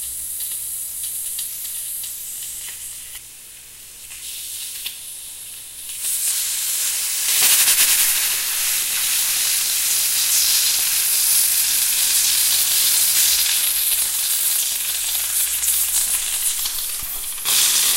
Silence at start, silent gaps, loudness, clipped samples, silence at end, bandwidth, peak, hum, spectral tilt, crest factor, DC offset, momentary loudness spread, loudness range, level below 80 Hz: 0 s; none; -16 LUFS; under 0.1%; 0 s; 16 kHz; 0 dBFS; none; 3.5 dB/octave; 20 dB; under 0.1%; 17 LU; 14 LU; -52 dBFS